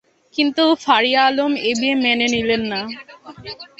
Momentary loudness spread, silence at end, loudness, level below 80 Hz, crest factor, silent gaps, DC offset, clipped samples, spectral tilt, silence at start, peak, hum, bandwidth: 18 LU; 0.15 s; -17 LUFS; -54 dBFS; 18 dB; none; under 0.1%; under 0.1%; -3 dB/octave; 0.35 s; -2 dBFS; none; 8.2 kHz